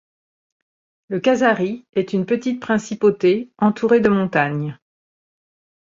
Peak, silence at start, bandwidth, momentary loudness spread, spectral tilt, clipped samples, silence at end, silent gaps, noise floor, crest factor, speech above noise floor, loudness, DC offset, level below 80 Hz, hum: -2 dBFS; 1.1 s; 7.6 kHz; 7 LU; -6.5 dB/octave; under 0.1%; 1.15 s; 1.89-1.93 s; under -90 dBFS; 18 dB; over 72 dB; -19 LUFS; under 0.1%; -60 dBFS; none